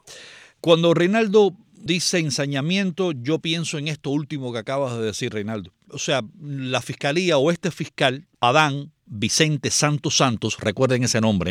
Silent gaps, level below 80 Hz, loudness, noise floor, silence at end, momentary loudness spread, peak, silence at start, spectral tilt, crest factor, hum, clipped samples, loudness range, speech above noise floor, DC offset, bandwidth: none; -58 dBFS; -21 LUFS; -45 dBFS; 0 s; 11 LU; -4 dBFS; 0.05 s; -4 dB/octave; 18 dB; none; under 0.1%; 6 LU; 23 dB; under 0.1%; 16 kHz